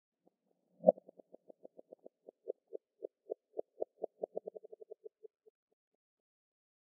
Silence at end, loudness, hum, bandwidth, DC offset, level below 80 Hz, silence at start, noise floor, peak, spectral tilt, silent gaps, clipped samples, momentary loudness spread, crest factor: 2.4 s; -39 LUFS; none; 1 kHz; under 0.1%; under -90 dBFS; 0.85 s; -79 dBFS; -8 dBFS; 0.5 dB/octave; none; under 0.1%; 27 LU; 34 dB